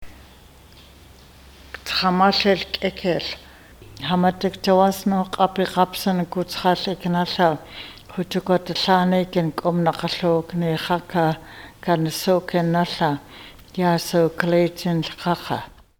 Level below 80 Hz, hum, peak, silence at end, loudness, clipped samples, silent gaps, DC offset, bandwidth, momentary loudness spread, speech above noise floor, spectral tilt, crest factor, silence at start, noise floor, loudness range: -50 dBFS; none; -2 dBFS; 0.3 s; -21 LUFS; under 0.1%; none; under 0.1%; 19 kHz; 13 LU; 26 dB; -5.5 dB/octave; 20 dB; 0 s; -47 dBFS; 2 LU